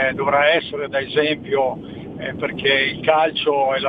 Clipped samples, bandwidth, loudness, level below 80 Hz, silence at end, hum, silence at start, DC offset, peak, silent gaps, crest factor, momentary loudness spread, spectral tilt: under 0.1%; 5 kHz; -19 LUFS; -54 dBFS; 0 s; none; 0 s; under 0.1%; -2 dBFS; none; 18 dB; 11 LU; -7 dB/octave